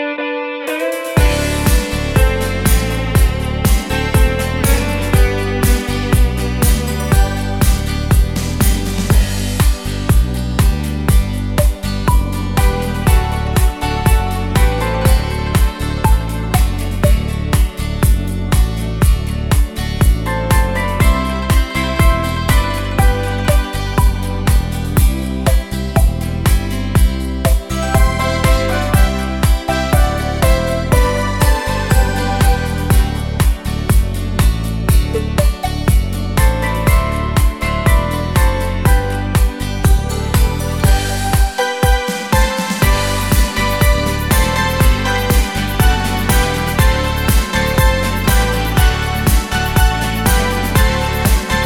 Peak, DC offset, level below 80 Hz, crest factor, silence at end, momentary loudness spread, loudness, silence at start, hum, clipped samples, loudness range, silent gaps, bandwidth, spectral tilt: 0 dBFS; 0.5%; -16 dBFS; 14 dB; 0 s; 3 LU; -15 LUFS; 0 s; none; under 0.1%; 2 LU; none; 18 kHz; -5 dB/octave